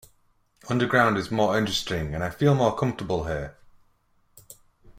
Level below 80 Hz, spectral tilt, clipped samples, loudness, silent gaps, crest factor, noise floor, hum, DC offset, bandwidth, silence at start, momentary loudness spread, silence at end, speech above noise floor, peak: -48 dBFS; -5.5 dB/octave; under 0.1%; -24 LUFS; none; 22 dB; -65 dBFS; none; under 0.1%; 16 kHz; 0.65 s; 10 LU; 0.45 s; 41 dB; -6 dBFS